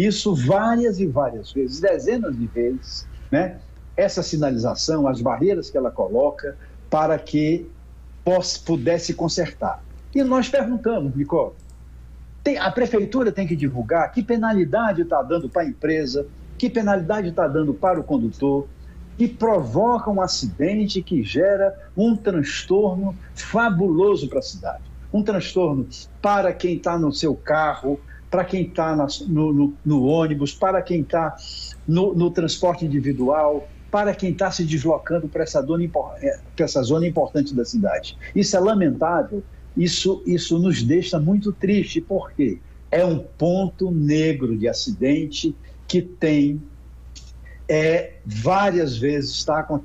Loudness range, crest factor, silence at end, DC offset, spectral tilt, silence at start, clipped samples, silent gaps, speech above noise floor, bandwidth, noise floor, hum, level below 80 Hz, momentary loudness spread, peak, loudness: 2 LU; 14 dB; 0 s; under 0.1%; -6 dB/octave; 0 s; under 0.1%; none; 20 dB; 8.4 kHz; -41 dBFS; none; -42 dBFS; 8 LU; -6 dBFS; -21 LUFS